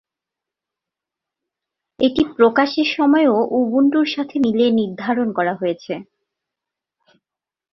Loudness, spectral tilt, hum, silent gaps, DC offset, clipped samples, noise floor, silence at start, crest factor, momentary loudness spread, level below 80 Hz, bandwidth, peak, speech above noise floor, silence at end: -17 LUFS; -6.5 dB/octave; none; none; under 0.1%; under 0.1%; -88 dBFS; 2 s; 18 dB; 8 LU; -58 dBFS; 6 kHz; -2 dBFS; 71 dB; 1.7 s